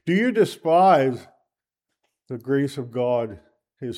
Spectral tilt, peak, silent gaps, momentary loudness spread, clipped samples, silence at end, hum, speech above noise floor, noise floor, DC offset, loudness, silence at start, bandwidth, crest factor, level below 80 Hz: -7 dB/octave; -6 dBFS; none; 19 LU; under 0.1%; 0 s; none; 63 dB; -84 dBFS; under 0.1%; -21 LUFS; 0.05 s; 15 kHz; 18 dB; -68 dBFS